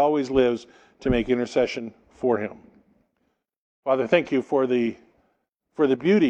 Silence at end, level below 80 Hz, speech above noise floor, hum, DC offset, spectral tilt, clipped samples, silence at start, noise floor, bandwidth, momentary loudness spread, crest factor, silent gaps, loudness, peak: 0 s; -46 dBFS; 51 dB; none; under 0.1%; -6.5 dB/octave; under 0.1%; 0 s; -73 dBFS; 8.4 kHz; 12 LU; 18 dB; 3.56-3.83 s; -24 LUFS; -6 dBFS